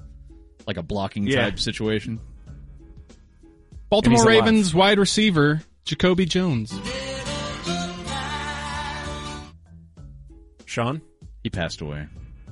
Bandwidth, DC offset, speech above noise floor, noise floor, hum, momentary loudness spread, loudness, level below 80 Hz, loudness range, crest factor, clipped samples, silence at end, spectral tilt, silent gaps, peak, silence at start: 11.5 kHz; under 0.1%; 31 dB; -51 dBFS; none; 17 LU; -22 LUFS; -42 dBFS; 13 LU; 18 dB; under 0.1%; 0 s; -5 dB/octave; none; -4 dBFS; 0.05 s